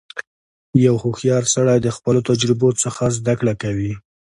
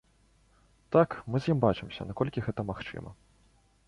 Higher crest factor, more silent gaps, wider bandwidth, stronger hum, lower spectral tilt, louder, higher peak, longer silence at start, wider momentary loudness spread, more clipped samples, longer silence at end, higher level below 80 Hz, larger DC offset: second, 16 dB vs 22 dB; first, 0.27-0.73 s vs none; about the same, 11.5 kHz vs 11 kHz; neither; second, -5.5 dB/octave vs -8.5 dB/octave; first, -18 LUFS vs -30 LUFS; first, -2 dBFS vs -10 dBFS; second, 0.15 s vs 0.9 s; second, 10 LU vs 15 LU; neither; second, 0.3 s vs 0.75 s; first, -48 dBFS vs -54 dBFS; neither